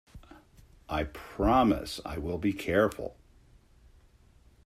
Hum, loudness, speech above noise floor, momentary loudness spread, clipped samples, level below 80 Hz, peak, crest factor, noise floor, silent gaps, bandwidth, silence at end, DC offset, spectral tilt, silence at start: none; -29 LUFS; 31 dB; 13 LU; under 0.1%; -46 dBFS; -12 dBFS; 20 dB; -60 dBFS; none; 15.5 kHz; 1.55 s; under 0.1%; -6 dB/octave; 0.15 s